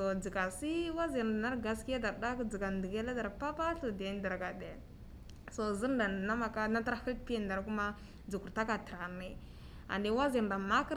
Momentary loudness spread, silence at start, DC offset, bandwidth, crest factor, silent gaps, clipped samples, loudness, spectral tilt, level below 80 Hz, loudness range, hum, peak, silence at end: 15 LU; 0 s; under 0.1%; 15.5 kHz; 18 dB; none; under 0.1%; -37 LUFS; -5.5 dB/octave; -52 dBFS; 3 LU; none; -20 dBFS; 0 s